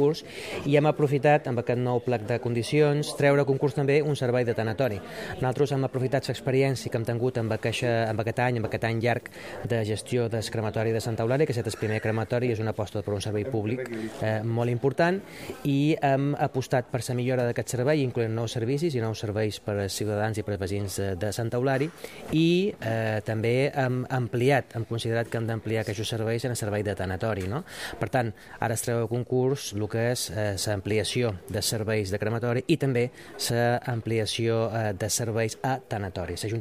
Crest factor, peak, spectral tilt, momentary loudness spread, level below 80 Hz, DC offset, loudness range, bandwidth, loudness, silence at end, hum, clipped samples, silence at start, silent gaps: 20 dB; -8 dBFS; -5.5 dB/octave; 7 LU; -58 dBFS; 0.1%; 4 LU; 15.5 kHz; -27 LUFS; 0 s; none; under 0.1%; 0 s; none